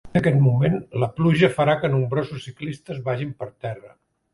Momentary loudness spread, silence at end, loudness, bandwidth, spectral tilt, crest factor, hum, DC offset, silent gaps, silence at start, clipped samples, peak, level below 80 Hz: 15 LU; 0.45 s; -22 LUFS; 11.5 kHz; -8 dB/octave; 18 dB; none; under 0.1%; none; 0.05 s; under 0.1%; -4 dBFS; -52 dBFS